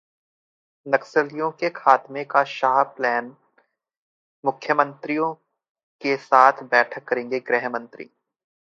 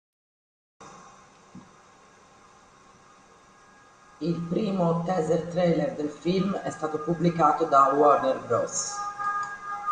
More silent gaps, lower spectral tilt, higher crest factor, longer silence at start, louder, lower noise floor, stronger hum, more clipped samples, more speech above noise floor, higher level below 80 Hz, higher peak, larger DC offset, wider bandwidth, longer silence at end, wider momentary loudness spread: first, 3.97-4.43 s, 5.69-5.75 s, 5.83-5.99 s vs none; about the same, -5 dB/octave vs -5.5 dB/octave; about the same, 24 dB vs 20 dB; about the same, 0.85 s vs 0.8 s; first, -21 LUFS vs -25 LUFS; first, -66 dBFS vs -55 dBFS; neither; neither; first, 44 dB vs 30 dB; second, -80 dBFS vs -62 dBFS; first, 0 dBFS vs -6 dBFS; neither; second, 7.6 kHz vs 9.8 kHz; first, 0.75 s vs 0 s; about the same, 13 LU vs 11 LU